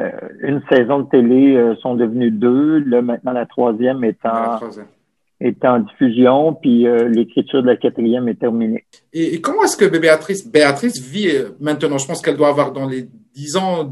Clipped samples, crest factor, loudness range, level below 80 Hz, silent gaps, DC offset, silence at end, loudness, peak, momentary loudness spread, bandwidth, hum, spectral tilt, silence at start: under 0.1%; 16 dB; 3 LU; -64 dBFS; none; under 0.1%; 0 s; -16 LUFS; 0 dBFS; 9 LU; 12.5 kHz; none; -5.5 dB/octave; 0 s